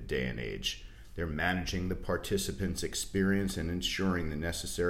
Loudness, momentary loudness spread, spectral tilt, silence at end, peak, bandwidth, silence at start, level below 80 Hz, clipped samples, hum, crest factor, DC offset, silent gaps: -33 LUFS; 6 LU; -4.5 dB/octave; 0 s; -16 dBFS; 16 kHz; 0 s; -44 dBFS; under 0.1%; none; 18 dB; under 0.1%; none